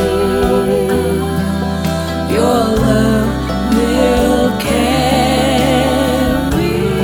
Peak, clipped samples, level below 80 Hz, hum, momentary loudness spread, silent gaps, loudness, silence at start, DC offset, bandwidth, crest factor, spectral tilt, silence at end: 0 dBFS; under 0.1%; -26 dBFS; none; 5 LU; none; -14 LUFS; 0 s; under 0.1%; over 20 kHz; 12 dB; -5.5 dB/octave; 0 s